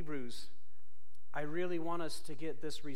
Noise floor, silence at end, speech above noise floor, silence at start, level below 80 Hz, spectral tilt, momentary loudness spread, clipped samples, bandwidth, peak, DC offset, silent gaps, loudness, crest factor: -72 dBFS; 0 s; 30 dB; 0 s; -70 dBFS; -5 dB/octave; 11 LU; under 0.1%; 16 kHz; -22 dBFS; 3%; none; -42 LUFS; 16 dB